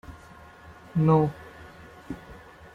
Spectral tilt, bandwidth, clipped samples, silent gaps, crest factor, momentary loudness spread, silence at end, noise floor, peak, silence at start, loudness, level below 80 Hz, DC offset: -9.5 dB/octave; 6.8 kHz; under 0.1%; none; 20 dB; 27 LU; 0.4 s; -49 dBFS; -8 dBFS; 0.1 s; -24 LUFS; -54 dBFS; under 0.1%